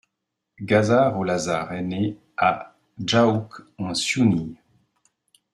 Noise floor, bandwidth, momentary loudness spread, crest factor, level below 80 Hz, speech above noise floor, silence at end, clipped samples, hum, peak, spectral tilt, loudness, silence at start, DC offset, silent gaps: -81 dBFS; 12.5 kHz; 14 LU; 20 dB; -58 dBFS; 59 dB; 1 s; under 0.1%; none; -4 dBFS; -5 dB/octave; -22 LUFS; 0.6 s; under 0.1%; none